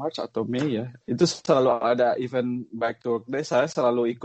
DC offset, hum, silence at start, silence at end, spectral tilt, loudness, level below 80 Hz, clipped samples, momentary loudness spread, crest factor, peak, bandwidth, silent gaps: under 0.1%; none; 0 s; 0 s; -5.5 dB/octave; -25 LUFS; -66 dBFS; under 0.1%; 9 LU; 18 dB; -6 dBFS; 8.8 kHz; none